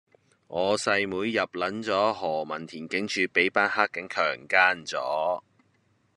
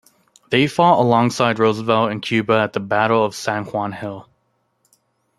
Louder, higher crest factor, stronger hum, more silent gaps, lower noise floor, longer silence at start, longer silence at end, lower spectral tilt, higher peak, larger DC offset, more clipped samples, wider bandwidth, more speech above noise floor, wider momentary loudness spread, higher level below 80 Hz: second, -26 LUFS vs -18 LUFS; about the same, 22 dB vs 18 dB; neither; neither; about the same, -67 dBFS vs -67 dBFS; about the same, 0.5 s vs 0.5 s; second, 0.75 s vs 1.15 s; second, -3.5 dB/octave vs -5.5 dB/octave; about the same, -4 dBFS vs -2 dBFS; neither; neither; second, 11.5 kHz vs 13 kHz; second, 41 dB vs 50 dB; about the same, 9 LU vs 10 LU; second, -72 dBFS vs -60 dBFS